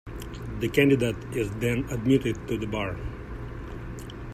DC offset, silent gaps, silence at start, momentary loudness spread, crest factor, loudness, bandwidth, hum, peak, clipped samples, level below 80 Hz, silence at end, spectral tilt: under 0.1%; none; 0.05 s; 17 LU; 20 dB; -26 LUFS; 15 kHz; none; -8 dBFS; under 0.1%; -42 dBFS; 0 s; -6.5 dB/octave